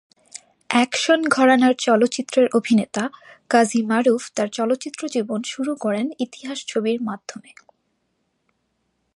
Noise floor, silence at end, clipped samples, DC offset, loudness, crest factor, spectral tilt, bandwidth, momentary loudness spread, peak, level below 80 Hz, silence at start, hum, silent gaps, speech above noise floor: -71 dBFS; 1.8 s; under 0.1%; under 0.1%; -20 LUFS; 20 dB; -4 dB/octave; 11.5 kHz; 13 LU; -2 dBFS; -70 dBFS; 0.35 s; none; none; 51 dB